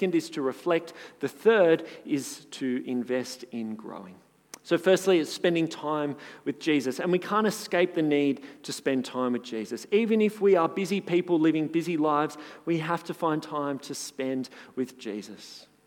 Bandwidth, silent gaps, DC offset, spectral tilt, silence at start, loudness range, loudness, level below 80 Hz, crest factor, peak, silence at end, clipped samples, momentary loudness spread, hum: 18 kHz; none; under 0.1%; -5 dB/octave; 0 s; 4 LU; -27 LUFS; -82 dBFS; 18 dB; -10 dBFS; 0.25 s; under 0.1%; 14 LU; none